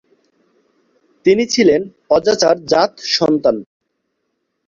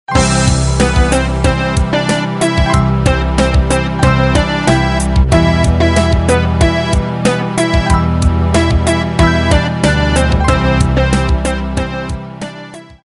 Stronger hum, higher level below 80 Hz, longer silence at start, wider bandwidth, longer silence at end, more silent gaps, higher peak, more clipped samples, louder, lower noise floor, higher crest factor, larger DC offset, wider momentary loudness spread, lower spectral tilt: neither; second, -54 dBFS vs -18 dBFS; first, 1.25 s vs 0.1 s; second, 7.6 kHz vs 11.5 kHz; first, 1.05 s vs 0.2 s; neither; about the same, 0 dBFS vs 0 dBFS; neither; second, -15 LUFS vs -12 LUFS; first, -71 dBFS vs -32 dBFS; about the same, 16 dB vs 12 dB; neither; about the same, 6 LU vs 5 LU; second, -4 dB/octave vs -5.5 dB/octave